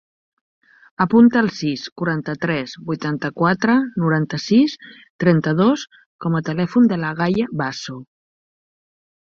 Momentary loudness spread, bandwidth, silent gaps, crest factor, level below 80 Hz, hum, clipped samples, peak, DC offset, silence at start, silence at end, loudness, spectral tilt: 10 LU; 7 kHz; 1.92-1.96 s, 5.10-5.19 s, 6.06-6.19 s; 18 dB; -58 dBFS; none; under 0.1%; -2 dBFS; under 0.1%; 1 s; 1.3 s; -19 LUFS; -7 dB/octave